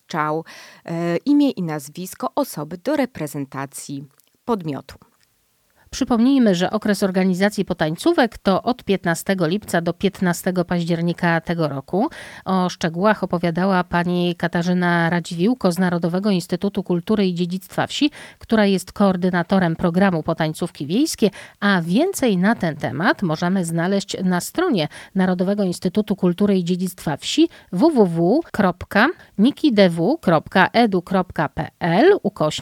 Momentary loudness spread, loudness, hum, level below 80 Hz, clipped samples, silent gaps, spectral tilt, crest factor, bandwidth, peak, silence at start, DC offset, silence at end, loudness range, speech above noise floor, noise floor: 9 LU; -20 LUFS; none; -52 dBFS; under 0.1%; none; -6 dB/octave; 20 dB; 16.5 kHz; 0 dBFS; 0.1 s; under 0.1%; 0 s; 5 LU; 44 dB; -63 dBFS